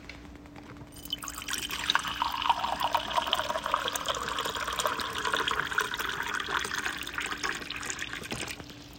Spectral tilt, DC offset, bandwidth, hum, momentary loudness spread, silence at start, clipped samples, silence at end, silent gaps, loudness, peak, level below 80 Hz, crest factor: -1.5 dB/octave; under 0.1%; 17 kHz; none; 12 LU; 0 s; under 0.1%; 0 s; none; -31 LUFS; -6 dBFS; -54 dBFS; 26 dB